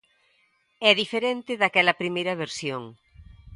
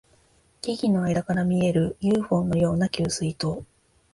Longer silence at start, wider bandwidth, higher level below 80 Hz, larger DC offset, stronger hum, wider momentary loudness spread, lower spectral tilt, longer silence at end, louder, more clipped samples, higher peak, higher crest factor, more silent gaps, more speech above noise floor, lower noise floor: first, 0.8 s vs 0.65 s; about the same, 11.5 kHz vs 11.5 kHz; second, -58 dBFS vs -50 dBFS; neither; neither; first, 12 LU vs 8 LU; second, -3.5 dB/octave vs -6.5 dB/octave; second, 0 s vs 0.5 s; about the same, -23 LUFS vs -24 LUFS; neither; first, -2 dBFS vs -10 dBFS; first, 24 dB vs 14 dB; neither; first, 42 dB vs 37 dB; first, -67 dBFS vs -61 dBFS